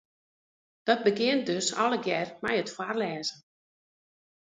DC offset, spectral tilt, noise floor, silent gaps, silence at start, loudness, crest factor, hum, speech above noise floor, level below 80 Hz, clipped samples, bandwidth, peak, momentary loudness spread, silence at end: under 0.1%; -3.5 dB/octave; under -90 dBFS; none; 0.85 s; -28 LUFS; 22 dB; none; over 62 dB; -74 dBFS; under 0.1%; 9.6 kHz; -10 dBFS; 8 LU; 1.15 s